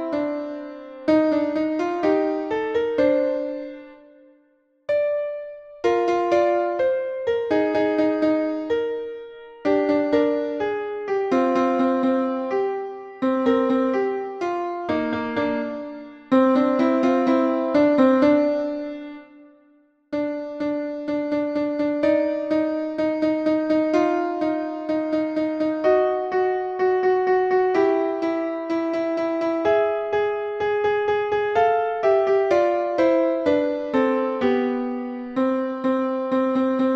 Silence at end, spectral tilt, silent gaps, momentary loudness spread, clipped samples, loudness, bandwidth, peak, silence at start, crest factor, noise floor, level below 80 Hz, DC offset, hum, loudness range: 0 s; -6.5 dB/octave; none; 9 LU; under 0.1%; -22 LUFS; 7.6 kHz; -4 dBFS; 0 s; 18 dB; -62 dBFS; -60 dBFS; under 0.1%; none; 4 LU